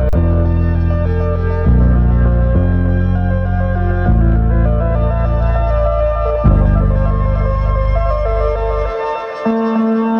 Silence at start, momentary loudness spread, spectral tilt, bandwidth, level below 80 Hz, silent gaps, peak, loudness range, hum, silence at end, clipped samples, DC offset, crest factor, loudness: 0 s; 4 LU; -10.5 dB/octave; 5.6 kHz; -16 dBFS; none; -2 dBFS; 1 LU; none; 0 s; under 0.1%; under 0.1%; 12 dB; -15 LUFS